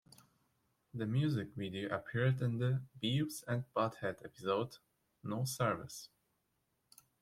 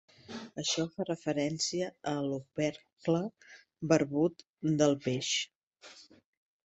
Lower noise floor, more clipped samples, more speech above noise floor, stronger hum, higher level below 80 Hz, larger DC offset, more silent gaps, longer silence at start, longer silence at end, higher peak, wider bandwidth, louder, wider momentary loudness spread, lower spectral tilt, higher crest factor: first, -82 dBFS vs -56 dBFS; neither; first, 45 dB vs 24 dB; neither; about the same, -72 dBFS vs -72 dBFS; neither; second, none vs 2.93-2.97 s, 4.49-4.54 s, 5.56-5.71 s; first, 0.95 s vs 0.3 s; first, 1.15 s vs 0.65 s; second, -20 dBFS vs -10 dBFS; first, 15.5 kHz vs 8.4 kHz; second, -38 LUFS vs -32 LUFS; second, 11 LU vs 15 LU; first, -6 dB/octave vs -4.5 dB/octave; about the same, 20 dB vs 22 dB